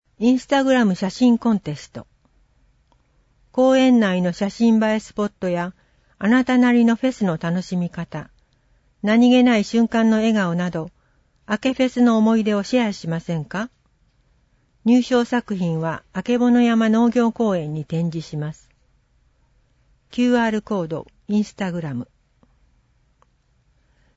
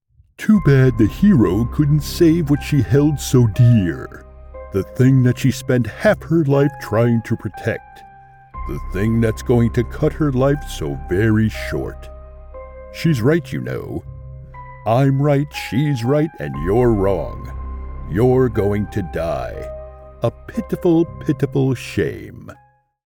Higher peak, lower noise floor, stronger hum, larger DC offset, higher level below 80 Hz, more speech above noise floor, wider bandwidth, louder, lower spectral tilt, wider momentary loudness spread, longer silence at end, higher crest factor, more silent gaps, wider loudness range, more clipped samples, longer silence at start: second, -6 dBFS vs -2 dBFS; first, -62 dBFS vs -41 dBFS; neither; neither; second, -56 dBFS vs -34 dBFS; first, 43 dB vs 24 dB; second, 8 kHz vs 18 kHz; about the same, -19 LUFS vs -18 LUFS; about the same, -6.5 dB/octave vs -7.5 dB/octave; second, 14 LU vs 18 LU; first, 2.1 s vs 0.5 s; about the same, 14 dB vs 14 dB; neither; about the same, 6 LU vs 6 LU; neither; second, 0.2 s vs 0.4 s